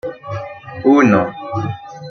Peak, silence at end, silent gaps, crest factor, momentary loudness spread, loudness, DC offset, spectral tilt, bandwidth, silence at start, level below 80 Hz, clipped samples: -2 dBFS; 0 s; none; 16 dB; 17 LU; -16 LUFS; under 0.1%; -7.5 dB/octave; 6.6 kHz; 0.05 s; -54 dBFS; under 0.1%